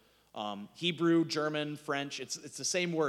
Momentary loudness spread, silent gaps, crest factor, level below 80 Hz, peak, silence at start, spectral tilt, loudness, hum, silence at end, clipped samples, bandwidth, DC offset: 12 LU; none; 16 dB; -80 dBFS; -18 dBFS; 0.35 s; -4 dB/octave; -33 LUFS; none; 0 s; under 0.1%; 13 kHz; under 0.1%